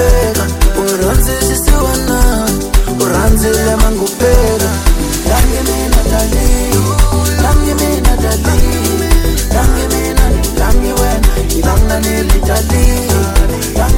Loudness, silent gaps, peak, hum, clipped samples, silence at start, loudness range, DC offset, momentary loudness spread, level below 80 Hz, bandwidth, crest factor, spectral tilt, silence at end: -12 LUFS; none; 0 dBFS; none; 0.3%; 0 s; 1 LU; under 0.1%; 3 LU; -12 dBFS; 17.5 kHz; 10 dB; -4.5 dB/octave; 0 s